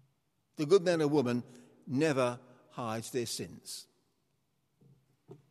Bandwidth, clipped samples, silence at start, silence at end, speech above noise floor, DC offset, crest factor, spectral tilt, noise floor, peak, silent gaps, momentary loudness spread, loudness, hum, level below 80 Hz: 14.5 kHz; under 0.1%; 0.6 s; 0.15 s; 47 dB; under 0.1%; 20 dB; -5.5 dB/octave; -78 dBFS; -14 dBFS; none; 21 LU; -32 LUFS; none; -78 dBFS